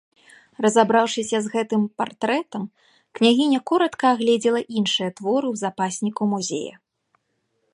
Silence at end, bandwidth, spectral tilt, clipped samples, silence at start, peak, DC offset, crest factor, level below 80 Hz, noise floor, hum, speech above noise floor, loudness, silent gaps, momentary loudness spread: 1.05 s; 11.5 kHz; -4 dB/octave; under 0.1%; 0.6 s; -2 dBFS; under 0.1%; 20 dB; -72 dBFS; -72 dBFS; none; 51 dB; -21 LUFS; none; 9 LU